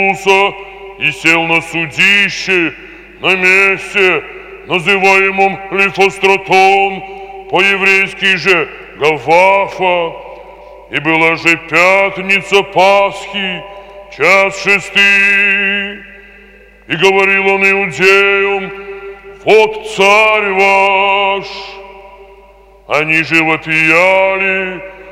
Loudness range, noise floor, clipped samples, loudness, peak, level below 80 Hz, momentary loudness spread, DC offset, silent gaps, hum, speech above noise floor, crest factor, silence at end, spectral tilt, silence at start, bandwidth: 2 LU; -41 dBFS; 0.2%; -10 LUFS; 0 dBFS; -46 dBFS; 13 LU; under 0.1%; none; none; 30 dB; 12 dB; 0 s; -3.5 dB/octave; 0 s; 16 kHz